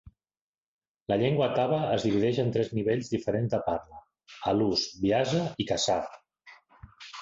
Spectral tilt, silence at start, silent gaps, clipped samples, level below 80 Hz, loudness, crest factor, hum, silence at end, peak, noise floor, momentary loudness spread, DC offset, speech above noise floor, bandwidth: -5.5 dB/octave; 0.05 s; 0.41-0.79 s, 0.88-0.95 s, 1.02-1.06 s; under 0.1%; -58 dBFS; -28 LUFS; 16 dB; none; 0 s; -12 dBFS; under -90 dBFS; 9 LU; under 0.1%; over 63 dB; 8 kHz